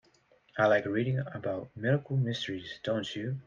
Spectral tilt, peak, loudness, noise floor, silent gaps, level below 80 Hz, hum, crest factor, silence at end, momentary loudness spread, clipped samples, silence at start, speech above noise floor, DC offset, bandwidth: -7 dB/octave; -12 dBFS; -31 LUFS; -65 dBFS; none; -68 dBFS; none; 18 dB; 0.05 s; 10 LU; under 0.1%; 0.55 s; 35 dB; under 0.1%; 7.4 kHz